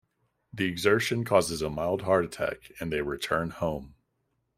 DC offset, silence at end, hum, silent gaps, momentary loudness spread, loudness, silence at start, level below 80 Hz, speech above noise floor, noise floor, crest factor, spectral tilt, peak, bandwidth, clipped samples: under 0.1%; 0.7 s; none; none; 9 LU; -28 LUFS; 0.55 s; -54 dBFS; 49 dB; -77 dBFS; 22 dB; -5 dB/octave; -8 dBFS; 16 kHz; under 0.1%